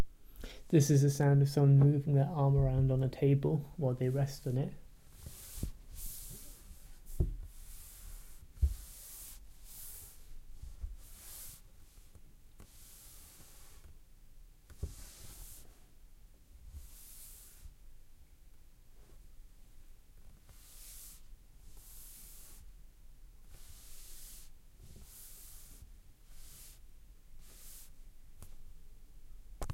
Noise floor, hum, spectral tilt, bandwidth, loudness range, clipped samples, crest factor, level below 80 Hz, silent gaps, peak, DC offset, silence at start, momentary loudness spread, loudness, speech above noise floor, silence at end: -57 dBFS; none; -7 dB/octave; 16.5 kHz; 27 LU; under 0.1%; 22 dB; -48 dBFS; none; -16 dBFS; under 0.1%; 0 s; 28 LU; -32 LUFS; 28 dB; 0 s